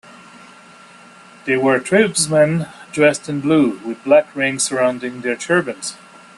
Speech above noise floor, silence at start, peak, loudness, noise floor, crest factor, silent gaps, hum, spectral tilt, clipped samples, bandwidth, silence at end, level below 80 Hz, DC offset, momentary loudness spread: 27 dB; 1.45 s; -2 dBFS; -17 LUFS; -43 dBFS; 18 dB; none; none; -4.5 dB/octave; under 0.1%; 12.5 kHz; 0.45 s; -60 dBFS; under 0.1%; 12 LU